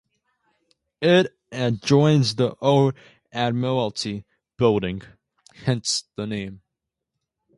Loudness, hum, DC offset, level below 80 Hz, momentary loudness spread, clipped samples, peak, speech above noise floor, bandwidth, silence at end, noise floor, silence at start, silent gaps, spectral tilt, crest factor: -22 LUFS; none; under 0.1%; -56 dBFS; 13 LU; under 0.1%; -4 dBFS; 62 dB; 11.5 kHz; 1 s; -83 dBFS; 1 s; none; -5.5 dB/octave; 20 dB